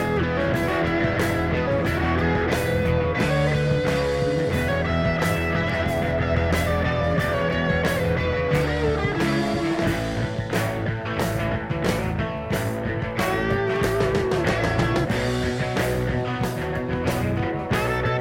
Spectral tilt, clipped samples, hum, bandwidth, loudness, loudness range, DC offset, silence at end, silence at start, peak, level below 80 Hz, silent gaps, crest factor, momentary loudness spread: -6 dB/octave; under 0.1%; none; 17 kHz; -23 LUFS; 3 LU; under 0.1%; 0 s; 0 s; -8 dBFS; -36 dBFS; none; 16 dB; 4 LU